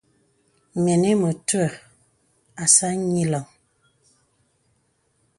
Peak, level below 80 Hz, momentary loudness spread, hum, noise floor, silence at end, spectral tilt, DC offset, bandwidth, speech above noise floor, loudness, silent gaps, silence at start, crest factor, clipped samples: -2 dBFS; -64 dBFS; 13 LU; none; -67 dBFS; 1.95 s; -4.5 dB/octave; under 0.1%; 11.5 kHz; 47 dB; -20 LUFS; none; 0.75 s; 22 dB; under 0.1%